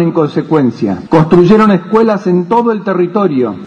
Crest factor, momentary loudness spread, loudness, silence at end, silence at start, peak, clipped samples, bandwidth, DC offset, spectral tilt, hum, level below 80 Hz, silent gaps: 10 dB; 6 LU; -10 LUFS; 0 s; 0 s; 0 dBFS; 0.4%; 8.2 kHz; under 0.1%; -8.5 dB/octave; none; -44 dBFS; none